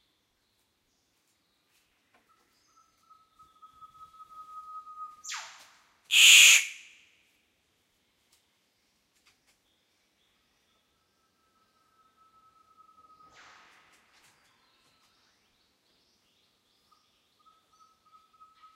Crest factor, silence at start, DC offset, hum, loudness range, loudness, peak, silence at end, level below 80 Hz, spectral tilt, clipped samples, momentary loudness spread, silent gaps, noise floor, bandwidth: 28 dB; 4.75 s; under 0.1%; none; 24 LU; -16 LUFS; -4 dBFS; 12.05 s; -86 dBFS; 6 dB/octave; under 0.1%; 33 LU; none; -74 dBFS; 16 kHz